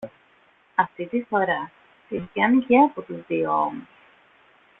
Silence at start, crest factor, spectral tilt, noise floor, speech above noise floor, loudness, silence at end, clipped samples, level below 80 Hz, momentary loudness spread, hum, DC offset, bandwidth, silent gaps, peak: 0 s; 20 dB; -9 dB/octave; -59 dBFS; 37 dB; -23 LUFS; 0.95 s; under 0.1%; -64 dBFS; 17 LU; none; under 0.1%; 4 kHz; none; -4 dBFS